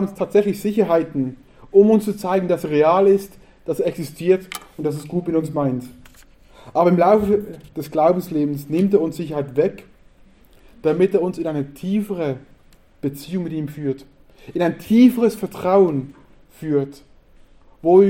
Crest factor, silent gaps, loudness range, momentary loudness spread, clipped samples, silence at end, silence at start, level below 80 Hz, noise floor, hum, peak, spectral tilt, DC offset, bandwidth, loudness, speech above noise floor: 18 dB; none; 6 LU; 14 LU; under 0.1%; 0 s; 0 s; -52 dBFS; -50 dBFS; none; -2 dBFS; -7.5 dB/octave; under 0.1%; 16.5 kHz; -19 LUFS; 32 dB